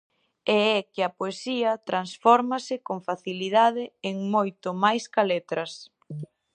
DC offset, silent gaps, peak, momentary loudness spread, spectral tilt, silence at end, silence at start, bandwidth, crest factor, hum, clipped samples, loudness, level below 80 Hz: under 0.1%; none; -4 dBFS; 12 LU; -5 dB/octave; 0.3 s; 0.45 s; 9.8 kHz; 22 dB; none; under 0.1%; -25 LUFS; -80 dBFS